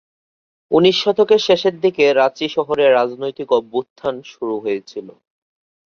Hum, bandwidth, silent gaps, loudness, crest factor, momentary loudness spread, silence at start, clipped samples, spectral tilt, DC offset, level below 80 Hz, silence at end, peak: none; 7 kHz; 3.90-3.96 s; -17 LUFS; 16 dB; 12 LU; 0.7 s; under 0.1%; -5 dB/octave; under 0.1%; -62 dBFS; 0.85 s; -2 dBFS